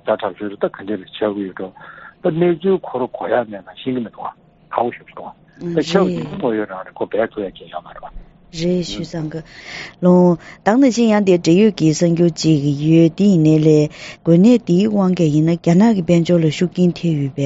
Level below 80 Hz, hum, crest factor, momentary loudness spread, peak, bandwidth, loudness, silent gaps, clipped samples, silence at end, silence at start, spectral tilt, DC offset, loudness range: -50 dBFS; none; 16 dB; 18 LU; 0 dBFS; 8 kHz; -16 LUFS; none; under 0.1%; 0 s; 0.05 s; -7 dB/octave; under 0.1%; 9 LU